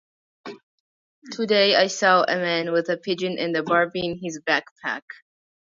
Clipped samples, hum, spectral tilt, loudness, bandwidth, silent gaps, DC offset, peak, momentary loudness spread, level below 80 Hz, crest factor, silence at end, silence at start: under 0.1%; none; -3.5 dB/octave; -22 LUFS; 7.8 kHz; 0.63-1.22 s, 4.71-4.76 s; under 0.1%; -4 dBFS; 18 LU; -66 dBFS; 20 dB; 0.7 s; 0.45 s